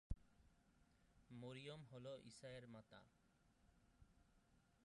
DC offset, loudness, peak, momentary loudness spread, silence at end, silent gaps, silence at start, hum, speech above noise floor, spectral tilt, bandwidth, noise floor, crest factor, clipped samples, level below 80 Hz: under 0.1%; -59 LUFS; -32 dBFS; 8 LU; 0 s; none; 0.1 s; none; 19 dB; -5.5 dB/octave; 11 kHz; -78 dBFS; 28 dB; under 0.1%; -66 dBFS